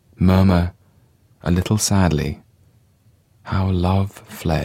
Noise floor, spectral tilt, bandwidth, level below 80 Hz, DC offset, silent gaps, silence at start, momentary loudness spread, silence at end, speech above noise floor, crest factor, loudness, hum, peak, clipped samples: -56 dBFS; -6 dB/octave; 15.5 kHz; -36 dBFS; under 0.1%; none; 0.2 s; 12 LU; 0 s; 39 dB; 18 dB; -19 LUFS; none; -2 dBFS; under 0.1%